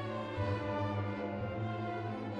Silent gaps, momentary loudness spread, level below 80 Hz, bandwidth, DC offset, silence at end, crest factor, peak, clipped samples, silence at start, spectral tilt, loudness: none; 3 LU; -60 dBFS; 7.4 kHz; under 0.1%; 0 s; 14 dB; -24 dBFS; under 0.1%; 0 s; -8 dB/octave; -38 LUFS